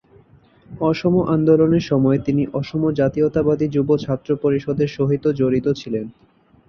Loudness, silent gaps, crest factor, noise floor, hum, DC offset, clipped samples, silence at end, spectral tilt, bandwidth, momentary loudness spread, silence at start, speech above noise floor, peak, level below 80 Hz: -19 LUFS; none; 16 dB; -51 dBFS; none; under 0.1%; under 0.1%; 0.55 s; -8.5 dB/octave; 6.8 kHz; 7 LU; 0.7 s; 33 dB; -4 dBFS; -48 dBFS